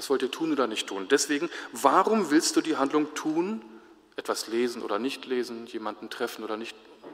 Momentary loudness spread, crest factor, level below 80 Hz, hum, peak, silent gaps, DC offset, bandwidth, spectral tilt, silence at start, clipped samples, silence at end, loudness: 13 LU; 24 dB; -76 dBFS; none; -4 dBFS; none; under 0.1%; 16 kHz; -3 dB/octave; 0 s; under 0.1%; 0 s; -27 LUFS